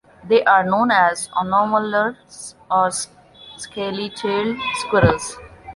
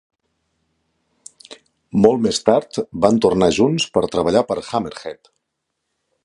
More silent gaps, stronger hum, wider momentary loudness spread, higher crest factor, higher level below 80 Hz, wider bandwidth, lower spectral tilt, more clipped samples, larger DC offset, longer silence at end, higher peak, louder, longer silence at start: neither; neither; first, 17 LU vs 13 LU; about the same, 18 dB vs 20 dB; first, -44 dBFS vs -50 dBFS; about the same, 11.5 kHz vs 11.5 kHz; about the same, -4.5 dB/octave vs -5.5 dB/octave; neither; neither; second, 0 s vs 1.1 s; about the same, -2 dBFS vs 0 dBFS; about the same, -19 LUFS vs -17 LUFS; second, 0.25 s vs 1.5 s